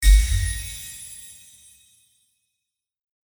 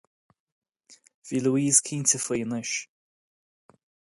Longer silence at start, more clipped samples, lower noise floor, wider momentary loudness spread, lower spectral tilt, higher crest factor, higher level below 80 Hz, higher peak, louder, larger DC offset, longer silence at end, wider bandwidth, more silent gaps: second, 0 s vs 0.9 s; neither; first, -83 dBFS vs -58 dBFS; first, 24 LU vs 11 LU; second, -2 dB/octave vs -3.5 dB/octave; about the same, 20 dB vs 24 dB; first, -24 dBFS vs -70 dBFS; about the same, -4 dBFS vs -6 dBFS; about the same, -25 LUFS vs -24 LUFS; neither; first, 2.1 s vs 1.35 s; first, over 20 kHz vs 11.5 kHz; second, none vs 1.14-1.22 s